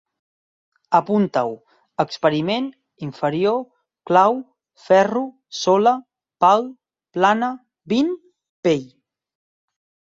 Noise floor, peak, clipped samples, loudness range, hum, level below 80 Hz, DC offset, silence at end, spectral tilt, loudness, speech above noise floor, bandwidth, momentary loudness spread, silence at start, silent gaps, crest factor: under -90 dBFS; -2 dBFS; under 0.1%; 4 LU; none; -66 dBFS; under 0.1%; 1.35 s; -5.5 dB/octave; -20 LUFS; over 72 dB; 7.8 kHz; 16 LU; 0.9 s; 8.49-8.63 s; 20 dB